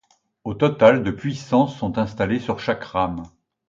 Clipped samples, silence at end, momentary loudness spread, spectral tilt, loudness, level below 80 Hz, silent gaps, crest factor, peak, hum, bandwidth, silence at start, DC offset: under 0.1%; 0.4 s; 13 LU; -7 dB/octave; -21 LUFS; -48 dBFS; none; 20 dB; 0 dBFS; none; 7.6 kHz; 0.45 s; under 0.1%